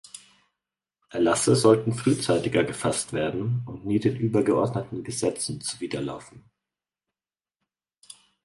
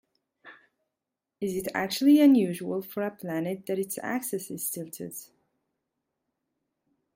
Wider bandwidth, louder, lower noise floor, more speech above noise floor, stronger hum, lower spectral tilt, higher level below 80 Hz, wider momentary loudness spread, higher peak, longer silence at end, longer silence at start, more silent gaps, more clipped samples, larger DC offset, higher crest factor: second, 11.5 kHz vs 16.5 kHz; about the same, -25 LUFS vs -27 LUFS; about the same, under -90 dBFS vs -87 dBFS; first, over 66 dB vs 60 dB; neither; about the same, -5 dB/octave vs -5 dB/octave; first, -58 dBFS vs -72 dBFS; second, 12 LU vs 17 LU; first, -6 dBFS vs -12 dBFS; first, 2.05 s vs 1.9 s; second, 0.15 s vs 0.45 s; neither; neither; neither; about the same, 22 dB vs 18 dB